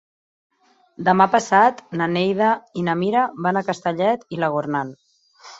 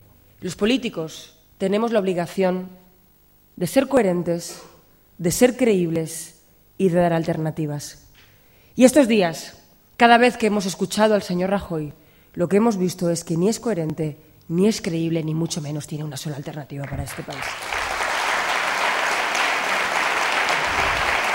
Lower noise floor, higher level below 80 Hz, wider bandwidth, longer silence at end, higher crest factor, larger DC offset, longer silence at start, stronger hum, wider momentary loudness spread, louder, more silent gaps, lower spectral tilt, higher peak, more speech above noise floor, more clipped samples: second, -47 dBFS vs -56 dBFS; second, -64 dBFS vs -50 dBFS; second, 8 kHz vs 16.5 kHz; about the same, 0.05 s vs 0 s; about the same, 18 dB vs 22 dB; neither; first, 1 s vs 0.4 s; neither; second, 9 LU vs 15 LU; about the same, -20 LUFS vs -21 LUFS; neither; first, -6 dB/octave vs -4.5 dB/octave; about the same, -2 dBFS vs 0 dBFS; second, 28 dB vs 35 dB; neither